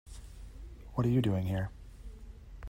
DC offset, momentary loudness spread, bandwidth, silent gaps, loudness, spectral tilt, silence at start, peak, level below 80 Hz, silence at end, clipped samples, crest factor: under 0.1%; 22 LU; 16 kHz; none; -33 LUFS; -8 dB/octave; 0.05 s; -18 dBFS; -48 dBFS; 0 s; under 0.1%; 18 dB